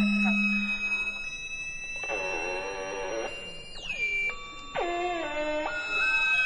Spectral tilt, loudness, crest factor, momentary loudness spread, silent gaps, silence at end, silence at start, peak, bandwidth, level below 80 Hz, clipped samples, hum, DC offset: -4 dB/octave; -29 LUFS; 14 dB; 11 LU; none; 0 s; 0 s; -16 dBFS; 10.5 kHz; -50 dBFS; under 0.1%; none; under 0.1%